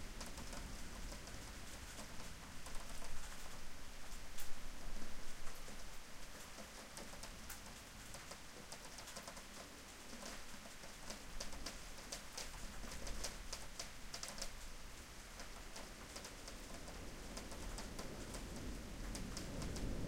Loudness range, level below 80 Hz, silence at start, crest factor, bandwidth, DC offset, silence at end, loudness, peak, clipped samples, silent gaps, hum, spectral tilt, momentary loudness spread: 4 LU; -52 dBFS; 0 s; 20 dB; 16.5 kHz; under 0.1%; 0 s; -51 LUFS; -26 dBFS; under 0.1%; none; none; -3 dB/octave; 6 LU